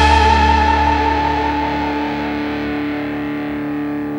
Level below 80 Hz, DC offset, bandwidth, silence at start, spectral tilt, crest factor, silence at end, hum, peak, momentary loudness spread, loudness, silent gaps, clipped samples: -24 dBFS; under 0.1%; 16.5 kHz; 0 s; -6 dB/octave; 14 dB; 0 s; none; -2 dBFS; 10 LU; -17 LUFS; none; under 0.1%